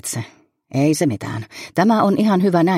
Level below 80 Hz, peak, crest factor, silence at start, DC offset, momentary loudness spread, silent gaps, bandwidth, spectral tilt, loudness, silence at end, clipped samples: -60 dBFS; -4 dBFS; 14 dB; 0.05 s; under 0.1%; 13 LU; none; 15.5 kHz; -6 dB/octave; -18 LUFS; 0 s; under 0.1%